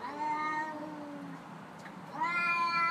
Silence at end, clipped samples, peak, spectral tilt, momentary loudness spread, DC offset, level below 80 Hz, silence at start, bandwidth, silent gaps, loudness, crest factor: 0 s; under 0.1%; -20 dBFS; -4.5 dB/octave; 18 LU; under 0.1%; -80 dBFS; 0 s; 15 kHz; none; -33 LUFS; 14 dB